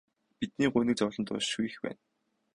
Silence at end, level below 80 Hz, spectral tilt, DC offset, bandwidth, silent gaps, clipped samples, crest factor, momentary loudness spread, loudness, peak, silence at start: 0.6 s; -64 dBFS; -4.5 dB/octave; under 0.1%; 11 kHz; none; under 0.1%; 18 dB; 13 LU; -32 LUFS; -14 dBFS; 0.4 s